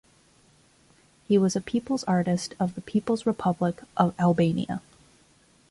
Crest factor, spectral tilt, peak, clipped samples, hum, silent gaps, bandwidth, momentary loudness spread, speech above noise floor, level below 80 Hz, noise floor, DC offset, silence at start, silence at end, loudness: 20 dB; -6.5 dB/octave; -8 dBFS; under 0.1%; none; none; 11.5 kHz; 7 LU; 35 dB; -60 dBFS; -60 dBFS; under 0.1%; 1.3 s; 0.9 s; -26 LUFS